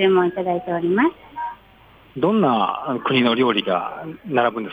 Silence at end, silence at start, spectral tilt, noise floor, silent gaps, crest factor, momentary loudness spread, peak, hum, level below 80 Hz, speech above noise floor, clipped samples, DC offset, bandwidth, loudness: 0 s; 0 s; -8 dB/octave; -49 dBFS; none; 16 dB; 14 LU; -4 dBFS; none; -58 dBFS; 30 dB; under 0.1%; under 0.1%; 5 kHz; -20 LUFS